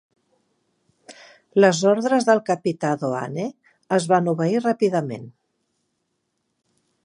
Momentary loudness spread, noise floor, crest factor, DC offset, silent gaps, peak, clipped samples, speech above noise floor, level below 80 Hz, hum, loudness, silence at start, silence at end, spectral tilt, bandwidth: 12 LU; -74 dBFS; 22 dB; under 0.1%; none; -2 dBFS; under 0.1%; 54 dB; -74 dBFS; none; -21 LUFS; 1.1 s; 1.75 s; -5.5 dB/octave; 11 kHz